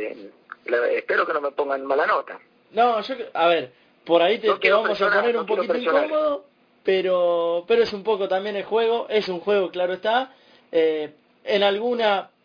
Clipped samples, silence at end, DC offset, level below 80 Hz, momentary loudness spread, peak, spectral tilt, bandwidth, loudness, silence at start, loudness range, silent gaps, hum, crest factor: under 0.1%; 0.2 s; under 0.1%; -68 dBFS; 11 LU; -4 dBFS; -5.5 dB/octave; 5.2 kHz; -22 LUFS; 0 s; 3 LU; none; none; 18 dB